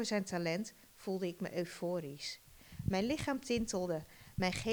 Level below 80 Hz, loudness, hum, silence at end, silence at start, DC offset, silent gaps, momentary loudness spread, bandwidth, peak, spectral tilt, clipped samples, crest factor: -58 dBFS; -39 LUFS; none; 0 s; 0 s; under 0.1%; none; 11 LU; over 20 kHz; -20 dBFS; -5 dB/octave; under 0.1%; 18 dB